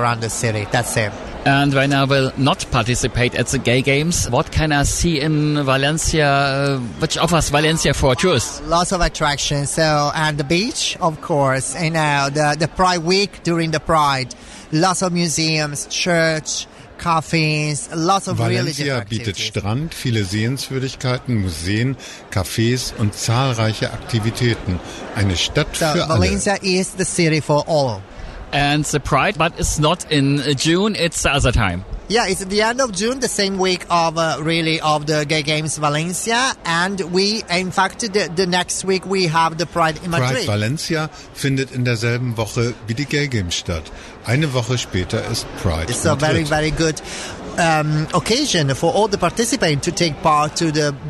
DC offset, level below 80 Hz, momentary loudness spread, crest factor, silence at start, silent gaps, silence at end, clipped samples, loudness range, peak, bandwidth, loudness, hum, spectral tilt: under 0.1%; -36 dBFS; 6 LU; 12 dB; 0 s; none; 0 s; under 0.1%; 4 LU; -6 dBFS; 12.5 kHz; -18 LUFS; none; -4.5 dB/octave